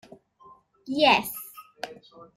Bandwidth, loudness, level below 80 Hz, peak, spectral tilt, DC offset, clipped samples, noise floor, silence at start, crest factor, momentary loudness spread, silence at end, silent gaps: 16 kHz; -23 LUFS; -66 dBFS; -6 dBFS; -3 dB/octave; under 0.1%; under 0.1%; -55 dBFS; 0.85 s; 22 dB; 20 LU; 0.15 s; none